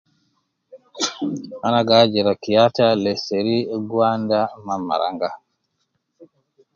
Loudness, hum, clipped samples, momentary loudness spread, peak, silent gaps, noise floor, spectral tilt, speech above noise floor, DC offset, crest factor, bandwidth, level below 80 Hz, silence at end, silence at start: -19 LUFS; none; under 0.1%; 12 LU; 0 dBFS; none; -72 dBFS; -5 dB/octave; 53 dB; under 0.1%; 20 dB; 7.6 kHz; -62 dBFS; 0.5 s; 0.75 s